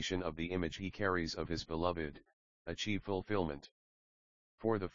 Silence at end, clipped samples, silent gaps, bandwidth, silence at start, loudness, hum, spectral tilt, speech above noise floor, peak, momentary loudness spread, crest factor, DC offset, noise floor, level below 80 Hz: 0 s; under 0.1%; 2.33-2.65 s, 3.71-4.58 s; 7.4 kHz; 0 s; -39 LUFS; none; -4 dB/octave; over 52 dB; -18 dBFS; 8 LU; 22 dB; 0.2%; under -90 dBFS; -58 dBFS